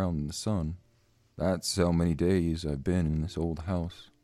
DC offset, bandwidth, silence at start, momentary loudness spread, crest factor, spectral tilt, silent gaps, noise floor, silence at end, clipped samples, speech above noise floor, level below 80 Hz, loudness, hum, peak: under 0.1%; 13.5 kHz; 0 s; 7 LU; 18 dB; -6 dB/octave; none; -66 dBFS; 0.2 s; under 0.1%; 37 dB; -44 dBFS; -30 LUFS; none; -12 dBFS